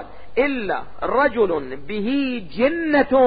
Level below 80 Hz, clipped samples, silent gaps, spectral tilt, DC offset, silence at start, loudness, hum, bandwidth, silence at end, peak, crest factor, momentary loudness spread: -48 dBFS; under 0.1%; none; -10.5 dB/octave; 2%; 0 s; -21 LUFS; none; 5 kHz; 0 s; -4 dBFS; 16 dB; 9 LU